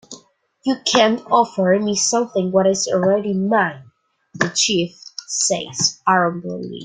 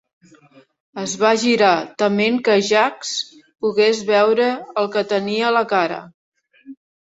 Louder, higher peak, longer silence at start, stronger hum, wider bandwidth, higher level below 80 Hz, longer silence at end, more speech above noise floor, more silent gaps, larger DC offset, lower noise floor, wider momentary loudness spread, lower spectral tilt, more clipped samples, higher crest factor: about the same, -18 LUFS vs -18 LUFS; about the same, -2 dBFS vs 0 dBFS; second, 0.1 s vs 0.95 s; neither; first, 9.6 kHz vs 8 kHz; about the same, -62 dBFS vs -66 dBFS; second, 0 s vs 0.3 s; about the same, 32 dB vs 33 dB; second, none vs 6.14-6.32 s; neither; about the same, -50 dBFS vs -50 dBFS; about the same, 8 LU vs 10 LU; about the same, -3 dB/octave vs -3.5 dB/octave; neither; about the same, 18 dB vs 18 dB